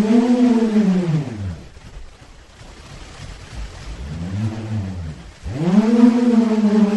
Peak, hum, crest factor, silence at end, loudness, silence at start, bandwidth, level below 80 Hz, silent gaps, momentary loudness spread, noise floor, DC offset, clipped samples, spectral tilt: -2 dBFS; none; 18 dB; 0 s; -17 LUFS; 0 s; 9.8 kHz; -40 dBFS; none; 23 LU; -43 dBFS; under 0.1%; under 0.1%; -8 dB/octave